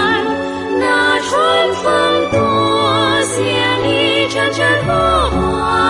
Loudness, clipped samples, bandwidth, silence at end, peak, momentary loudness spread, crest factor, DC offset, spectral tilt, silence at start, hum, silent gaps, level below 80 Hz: -14 LUFS; under 0.1%; 11.5 kHz; 0 s; -2 dBFS; 3 LU; 12 dB; under 0.1%; -4 dB/octave; 0 s; none; none; -34 dBFS